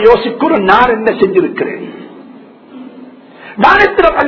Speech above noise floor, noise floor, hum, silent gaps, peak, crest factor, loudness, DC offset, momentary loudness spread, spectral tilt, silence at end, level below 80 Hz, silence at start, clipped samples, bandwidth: 26 dB; -36 dBFS; none; none; 0 dBFS; 12 dB; -10 LUFS; under 0.1%; 21 LU; -6.5 dB/octave; 0 s; -38 dBFS; 0 s; 1%; 6 kHz